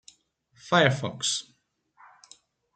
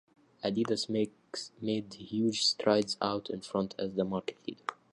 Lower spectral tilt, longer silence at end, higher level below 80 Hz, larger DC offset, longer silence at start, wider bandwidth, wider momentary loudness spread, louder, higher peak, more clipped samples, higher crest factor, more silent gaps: about the same, -3.5 dB/octave vs -4.5 dB/octave; first, 1.35 s vs 0.2 s; about the same, -68 dBFS vs -70 dBFS; neither; first, 0.65 s vs 0.45 s; second, 9.4 kHz vs 11.5 kHz; second, 7 LU vs 12 LU; first, -25 LUFS vs -33 LUFS; first, -4 dBFS vs -12 dBFS; neither; first, 26 dB vs 20 dB; neither